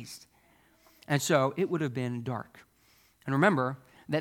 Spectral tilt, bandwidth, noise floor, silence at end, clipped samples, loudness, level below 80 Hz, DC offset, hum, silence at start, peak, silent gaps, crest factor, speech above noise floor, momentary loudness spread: -5.5 dB/octave; 18 kHz; -65 dBFS; 0 s; under 0.1%; -29 LUFS; -72 dBFS; under 0.1%; none; 0 s; -10 dBFS; none; 22 dB; 36 dB; 20 LU